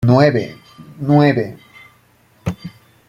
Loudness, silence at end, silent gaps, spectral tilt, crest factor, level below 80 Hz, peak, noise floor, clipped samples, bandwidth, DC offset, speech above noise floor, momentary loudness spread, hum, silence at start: -16 LUFS; 0.4 s; none; -8.5 dB/octave; 16 dB; -50 dBFS; -2 dBFS; -53 dBFS; under 0.1%; 9.8 kHz; under 0.1%; 39 dB; 18 LU; none; 0 s